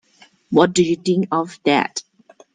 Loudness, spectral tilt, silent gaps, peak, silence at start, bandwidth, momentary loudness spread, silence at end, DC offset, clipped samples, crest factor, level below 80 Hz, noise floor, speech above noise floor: -18 LUFS; -5 dB/octave; none; 0 dBFS; 0.5 s; 9.6 kHz; 8 LU; 0.55 s; under 0.1%; under 0.1%; 20 dB; -62 dBFS; -52 dBFS; 35 dB